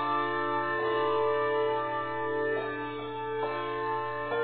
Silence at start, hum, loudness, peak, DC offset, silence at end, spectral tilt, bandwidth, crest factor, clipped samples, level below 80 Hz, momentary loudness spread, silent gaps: 0 s; none; -30 LUFS; -18 dBFS; 0.2%; 0 s; -3 dB/octave; 4.5 kHz; 12 dB; under 0.1%; -66 dBFS; 7 LU; none